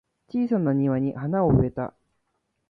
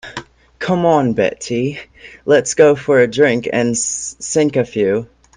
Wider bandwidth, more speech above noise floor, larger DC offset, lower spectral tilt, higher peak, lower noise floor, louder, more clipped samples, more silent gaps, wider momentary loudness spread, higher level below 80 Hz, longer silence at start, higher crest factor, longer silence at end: second, 4.9 kHz vs 10 kHz; first, 52 dB vs 19 dB; neither; first, -12 dB/octave vs -4.5 dB/octave; second, -8 dBFS vs 0 dBFS; first, -75 dBFS vs -34 dBFS; second, -24 LUFS vs -15 LUFS; neither; neither; about the same, 11 LU vs 12 LU; first, -46 dBFS vs -52 dBFS; first, 0.35 s vs 0.05 s; about the same, 16 dB vs 16 dB; first, 0.8 s vs 0.3 s